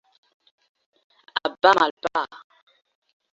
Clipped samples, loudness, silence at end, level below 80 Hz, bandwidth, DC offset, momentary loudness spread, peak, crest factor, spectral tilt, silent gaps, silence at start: under 0.1%; -22 LUFS; 1 s; -68 dBFS; 8 kHz; under 0.1%; 13 LU; -2 dBFS; 24 dB; -3 dB/octave; 1.91-1.97 s; 1.35 s